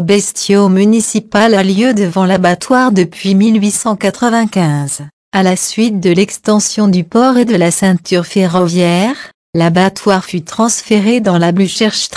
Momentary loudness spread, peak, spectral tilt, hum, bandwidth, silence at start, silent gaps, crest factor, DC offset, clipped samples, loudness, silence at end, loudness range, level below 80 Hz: 5 LU; 0 dBFS; -5 dB/octave; none; 11 kHz; 0 s; 5.13-5.32 s, 9.34-9.53 s; 10 dB; under 0.1%; under 0.1%; -11 LUFS; 0 s; 2 LU; -52 dBFS